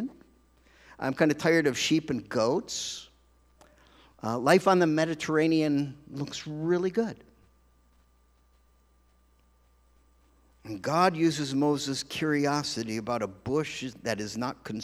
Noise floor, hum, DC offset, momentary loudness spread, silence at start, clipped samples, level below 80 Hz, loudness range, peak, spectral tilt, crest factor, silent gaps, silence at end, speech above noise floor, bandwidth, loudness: -64 dBFS; none; under 0.1%; 12 LU; 0 s; under 0.1%; -64 dBFS; 8 LU; -6 dBFS; -5 dB/octave; 22 dB; none; 0 s; 37 dB; 14.5 kHz; -28 LUFS